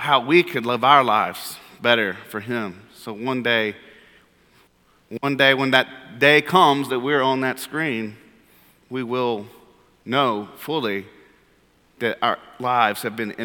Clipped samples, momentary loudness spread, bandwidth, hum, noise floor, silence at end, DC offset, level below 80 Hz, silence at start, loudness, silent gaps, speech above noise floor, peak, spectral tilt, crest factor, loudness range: under 0.1%; 15 LU; 19 kHz; none; -59 dBFS; 0 s; under 0.1%; -68 dBFS; 0 s; -20 LUFS; none; 38 dB; 0 dBFS; -4.5 dB/octave; 22 dB; 8 LU